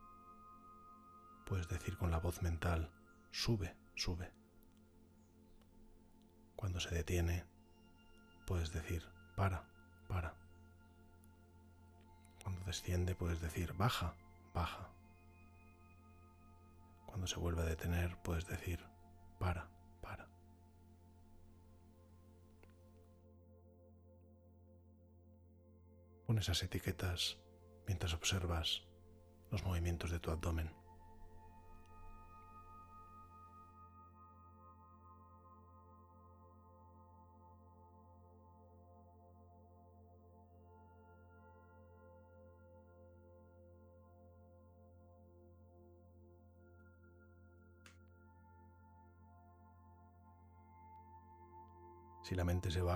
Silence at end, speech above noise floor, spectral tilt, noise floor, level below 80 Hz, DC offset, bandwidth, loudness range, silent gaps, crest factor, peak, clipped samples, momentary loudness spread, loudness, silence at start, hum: 0 s; 26 dB; -5 dB/octave; -66 dBFS; -56 dBFS; under 0.1%; 14.5 kHz; 23 LU; none; 24 dB; -22 dBFS; under 0.1%; 26 LU; -42 LUFS; 0 s; none